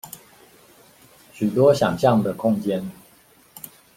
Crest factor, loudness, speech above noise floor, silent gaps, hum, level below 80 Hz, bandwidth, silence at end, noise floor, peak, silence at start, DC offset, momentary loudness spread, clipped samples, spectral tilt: 20 dB; -20 LUFS; 35 dB; none; none; -60 dBFS; 16.5 kHz; 0.3 s; -54 dBFS; -2 dBFS; 0.05 s; under 0.1%; 23 LU; under 0.1%; -6.5 dB/octave